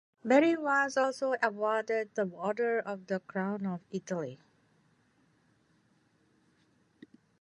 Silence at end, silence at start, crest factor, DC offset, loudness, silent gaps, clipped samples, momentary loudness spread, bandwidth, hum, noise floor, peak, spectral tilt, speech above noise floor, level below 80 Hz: 3.05 s; 0.25 s; 22 dB; under 0.1%; -31 LUFS; none; under 0.1%; 12 LU; 11 kHz; none; -70 dBFS; -12 dBFS; -5.5 dB/octave; 39 dB; -84 dBFS